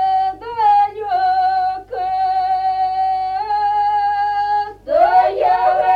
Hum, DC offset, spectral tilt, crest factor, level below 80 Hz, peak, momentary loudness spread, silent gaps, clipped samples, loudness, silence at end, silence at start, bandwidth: none; under 0.1%; -4.5 dB/octave; 14 dB; -50 dBFS; -4 dBFS; 6 LU; none; under 0.1%; -17 LUFS; 0 s; 0 s; 5.2 kHz